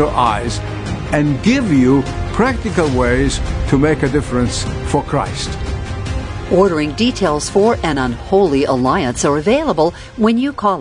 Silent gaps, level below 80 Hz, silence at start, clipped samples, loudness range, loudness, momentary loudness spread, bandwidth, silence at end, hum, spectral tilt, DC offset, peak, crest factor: none; -28 dBFS; 0 s; under 0.1%; 3 LU; -16 LUFS; 9 LU; 11 kHz; 0 s; none; -5.5 dB/octave; under 0.1%; 0 dBFS; 14 dB